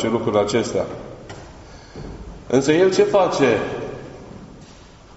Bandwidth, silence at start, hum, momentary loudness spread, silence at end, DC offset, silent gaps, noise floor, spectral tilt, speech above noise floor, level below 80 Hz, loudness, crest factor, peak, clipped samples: 8 kHz; 0 s; none; 23 LU; 0.35 s; under 0.1%; none; -44 dBFS; -4.5 dB/octave; 26 dB; -46 dBFS; -19 LUFS; 18 dB; -4 dBFS; under 0.1%